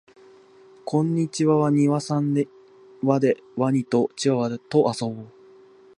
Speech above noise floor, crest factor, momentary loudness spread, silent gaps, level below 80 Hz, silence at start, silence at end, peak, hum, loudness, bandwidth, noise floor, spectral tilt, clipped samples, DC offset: 29 dB; 18 dB; 9 LU; none; -70 dBFS; 0.85 s; 0.7 s; -4 dBFS; none; -23 LUFS; 11 kHz; -51 dBFS; -7 dB/octave; under 0.1%; under 0.1%